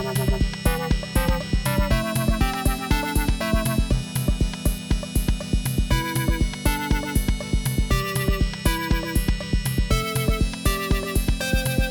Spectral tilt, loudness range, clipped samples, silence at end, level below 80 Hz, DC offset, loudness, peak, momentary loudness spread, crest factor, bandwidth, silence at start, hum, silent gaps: -5 dB/octave; 1 LU; under 0.1%; 0 s; -26 dBFS; under 0.1%; -24 LUFS; -6 dBFS; 3 LU; 16 dB; 17.5 kHz; 0 s; none; none